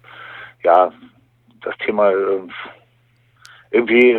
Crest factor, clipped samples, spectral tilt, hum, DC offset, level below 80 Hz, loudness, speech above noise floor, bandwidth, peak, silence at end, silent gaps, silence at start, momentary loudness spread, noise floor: 18 dB; under 0.1%; -6.5 dB/octave; none; under 0.1%; -64 dBFS; -17 LUFS; 42 dB; 5.2 kHz; 0 dBFS; 0 s; none; 0.2 s; 21 LU; -58 dBFS